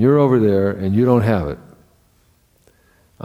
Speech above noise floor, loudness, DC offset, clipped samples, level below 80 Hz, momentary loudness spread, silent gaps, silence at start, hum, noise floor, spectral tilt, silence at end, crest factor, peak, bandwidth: 42 dB; -16 LUFS; under 0.1%; under 0.1%; -44 dBFS; 11 LU; none; 0 s; none; -57 dBFS; -9.5 dB/octave; 1.7 s; 16 dB; -2 dBFS; 15.5 kHz